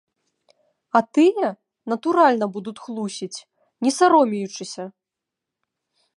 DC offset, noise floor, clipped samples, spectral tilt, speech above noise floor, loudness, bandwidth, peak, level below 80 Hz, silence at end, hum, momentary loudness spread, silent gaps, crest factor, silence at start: under 0.1%; -85 dBFS; under 0.1%; -4.5 dB/octave; 65 dB; -20 LUFS; 11.5 kHz; -2 dBFS; -78 dBFS; 1.25 s; none; 18 LU; none; 20 dB; 0.95 s